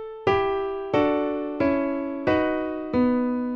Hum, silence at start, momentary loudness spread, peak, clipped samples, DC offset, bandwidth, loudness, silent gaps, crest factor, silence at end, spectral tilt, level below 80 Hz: none; 0 s; 5 LU; -8 dBFS; under 0.1%; under 0.1%; 6.6 kHz; -24 LUFS; none; 16 dB; 0 s; -8 dB/octave; -50 dBFS